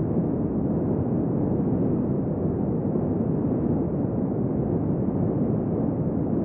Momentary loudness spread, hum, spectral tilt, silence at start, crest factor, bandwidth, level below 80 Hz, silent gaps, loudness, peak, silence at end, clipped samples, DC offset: 2 LU; none; -11 dB/octave; 0 s; 12 dB; 2.8 kHz; -42 dBFS; none; -25 LUFS; -12 dBFS; 0 s; under 0.1%; under 0.1%